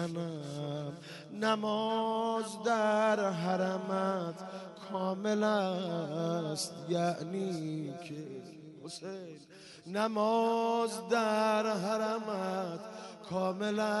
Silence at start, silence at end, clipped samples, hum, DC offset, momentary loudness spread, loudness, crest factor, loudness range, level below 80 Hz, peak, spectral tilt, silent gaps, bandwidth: 0 s; 0 s; under 0.1%; none; under 0.1%; 16 LU; -33 LUFS; 18 dB; 5 LU; -80 dBFS; -16 dBFS; -5.5 dB/octave; none; 11.5 kHz